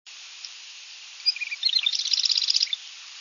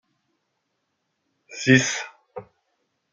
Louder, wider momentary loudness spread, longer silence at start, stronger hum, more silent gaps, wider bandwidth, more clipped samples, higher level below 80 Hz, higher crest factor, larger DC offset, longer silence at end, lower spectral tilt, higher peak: about the same, -22 LUFS vs -20 LUFS; second, 20 LU vs 24 LU; second, 0.05 s vs 1.5 s; neither; neither; second, 7.4 kHz vs 9.2 kHz; neither; second, under -90 dBFS vs -68 dBFS; about the same, 22 dB vs 26 dB; neither; second, 0 s vs 0.7 s; second, 9 dB/octave vs -4 dB/octave; second, -6 dBFS vs -2 dBFS